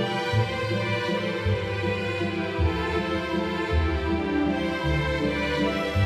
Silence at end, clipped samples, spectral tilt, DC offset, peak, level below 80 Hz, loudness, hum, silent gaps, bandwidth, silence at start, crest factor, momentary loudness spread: 0 s; under 0.1%; -6.5 dB/octave; under 0.1%; -12 dBFS; -36 dBFS; -26 LUFS; none; none; 14 kHz; 0 s; 14 dB; 2 LU